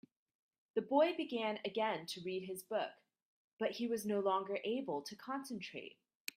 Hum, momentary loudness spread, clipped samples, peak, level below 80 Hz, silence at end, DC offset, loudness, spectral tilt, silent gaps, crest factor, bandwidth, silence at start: none; 12 LU; under 0.1%; -20 dBFS; -86 dBFS; 0.45 s; under 0.1%; -39 LUFS; -4.5 dB/octave; 3.22-3.57 s; 20 dB; 15.5 kHz; 0.75 s